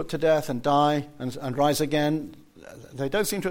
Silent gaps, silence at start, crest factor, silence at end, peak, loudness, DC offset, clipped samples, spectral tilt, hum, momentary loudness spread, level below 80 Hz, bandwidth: none; 0 s; 16 dB; 0 s; -10 dBFS; -25 LUFS; under 0.1%; under 0.1%; -5 dB/octave; none; 11 LU; -52 dBFS; 16.5 kHz